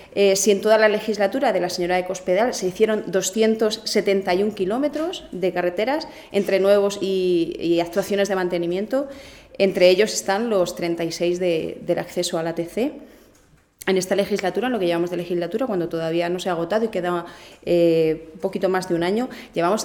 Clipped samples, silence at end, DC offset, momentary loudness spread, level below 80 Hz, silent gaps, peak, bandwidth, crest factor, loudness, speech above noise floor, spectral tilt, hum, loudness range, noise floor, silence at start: under 0.1%; 0 s; under 0.1%; 9 LU; -56 dBFS; none; -2 dBFS; 19.5 kHz; 18 dB; -21 LUFS; 34 dB; -4.5 dB/octave; none; 4 LU; -55 dBFS; 0 s